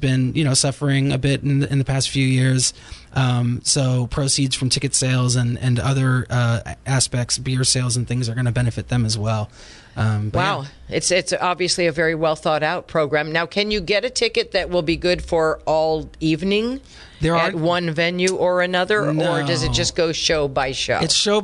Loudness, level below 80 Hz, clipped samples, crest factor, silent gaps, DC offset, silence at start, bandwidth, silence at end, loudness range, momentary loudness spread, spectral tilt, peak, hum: -19 LUFS; -40 dBFS; under 0.1%; 16 dB; none; under 0.1%; 0 s; 11.5 kHz; 0 s; 2 LU; 4 LU; -4.5 dB/octave; -4 dBFS; none